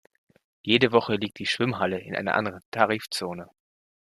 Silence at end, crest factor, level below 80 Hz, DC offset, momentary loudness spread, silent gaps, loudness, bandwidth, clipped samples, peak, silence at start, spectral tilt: 0.65 s; 24 dB; -64 dBFS; under 0.1%; 11 LU; 2.65-2.72 s; -25 LUFS; 14.5 kHz; under 0.1%; -4 dBFS; 0.65 s; -5 dB/octave